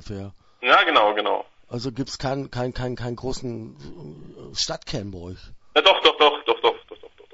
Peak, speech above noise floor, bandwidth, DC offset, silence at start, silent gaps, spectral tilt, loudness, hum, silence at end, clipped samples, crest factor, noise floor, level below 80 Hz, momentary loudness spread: -2 dBFS; 22 dB; 8 kHz; under 0.1%; 0.05 s; none; -3.5 dB/octave; -21 LUFS; none; 0.25 s; under 0.1%; 22 dB; -45 dBFS; -46 dBFS; 24 LU